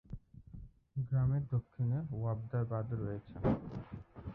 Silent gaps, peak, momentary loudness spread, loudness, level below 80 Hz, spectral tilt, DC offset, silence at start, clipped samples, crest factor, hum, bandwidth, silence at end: none; -20 dBFS; 19 LU; -37 LUFS; -54 dBFS; -12 dB/octave; under 0.1%; 0.1 s; under 0.1%; 18 dB; none; 3.8 kHz; 0 s